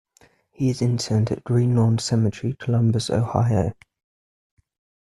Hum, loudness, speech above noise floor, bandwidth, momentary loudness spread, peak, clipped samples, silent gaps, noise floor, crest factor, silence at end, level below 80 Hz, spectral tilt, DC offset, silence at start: none; -22 LUFS; 38 dB; 11.5 kHz; 5 LU; -4 dBFS; under 0.1%; none; -58 dBFS; 18 dB; 1.4 s; -52 dBFS; -7 dB/octave; under 0.1%; 0.6 s